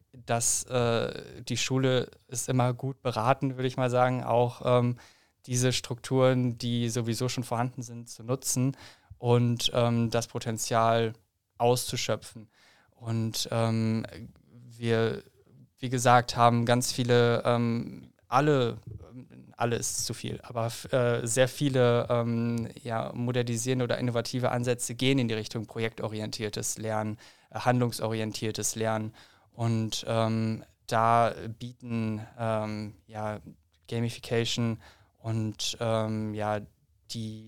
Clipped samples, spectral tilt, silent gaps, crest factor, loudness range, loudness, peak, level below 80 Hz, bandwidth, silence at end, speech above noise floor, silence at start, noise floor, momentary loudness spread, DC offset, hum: under 0.1%; -5 dB/octave; none; 24 dB; 6 LU; -28 LUFS; -6 dBFS; -60 dBFS; 16.5 kHz; 0 s; 30 dB; 0.15 s; -58 dBFS; 13 LU; 0.2%; none